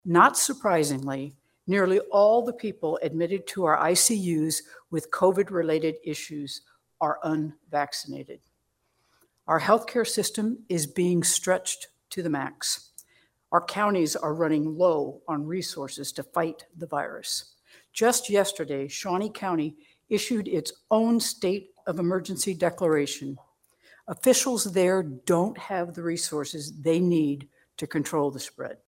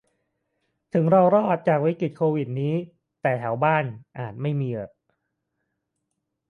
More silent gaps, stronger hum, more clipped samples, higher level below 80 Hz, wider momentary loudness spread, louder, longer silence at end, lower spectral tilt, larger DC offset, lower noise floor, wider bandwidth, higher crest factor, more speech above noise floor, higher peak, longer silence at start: neither; neither; neither; about the same, -72 dBFS vs -68 dBFS; second, 12 LU vs 16 LU; second, -26 LUFS vs -23 LUFS; second, 0.15 s vs 1.6 s; second, -4 dB/octave vs -10 dB/octave; neither; second, -74 dBFS vs -79 dBFS; first, 16.5 kHz vs 4.5 kHz; about the same, 22 dB vs 18 dB; second, 48 dB vs 57 dB; about the same, -4 dBFS vs -6 dBFS; second, 0.05 s vs 0.95 s